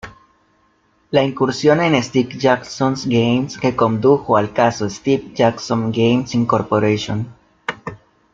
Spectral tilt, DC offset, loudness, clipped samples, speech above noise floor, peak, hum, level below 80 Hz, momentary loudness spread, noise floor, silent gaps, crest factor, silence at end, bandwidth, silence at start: -6 dB/octave; under 0.1%; -17 LUFS; under 0.1%; 43 dB; -2 dBFS; none; -52 dBFS; 11 LU; -59 dBFS; none; 16 dB; 0.35 s; 7.6 kHz; 0.05 s